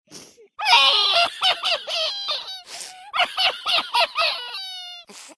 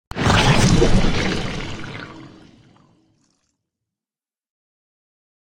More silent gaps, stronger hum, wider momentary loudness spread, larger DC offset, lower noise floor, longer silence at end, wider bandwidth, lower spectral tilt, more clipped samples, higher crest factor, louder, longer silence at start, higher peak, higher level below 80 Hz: neither; neither; about the same, 19 LU vs 19 LU; neither; second, -45 dBFS vs under -90 dBFS; second, 0.05 s vs 3.2 s; second, 11 kHz vs 16 kHz; second, 1.5 dB/octave vs -5 dB/octave; neither; about the same, 20 dB vs 18 dB; about the same, -19 LUFS vs -18 LUFS; about the same, 0.1 s vs 0.15 s; about the same, -2 dBFS vs -2 dBFS; second, -70 dBFS vs -28 dBFS